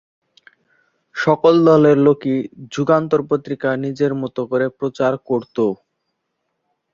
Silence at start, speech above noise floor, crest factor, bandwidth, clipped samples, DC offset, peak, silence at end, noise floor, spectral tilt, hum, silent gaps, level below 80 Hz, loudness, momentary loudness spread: 1.15 s; 57 dB; 16 dB; 7.4 kHz; under 0.1%; under 0.1%; -2 dBFS; 1.2 s; -74 dBFS; -7.5 dB/octave; none; none; -62 dBFS; -17 LUFS; 12 LU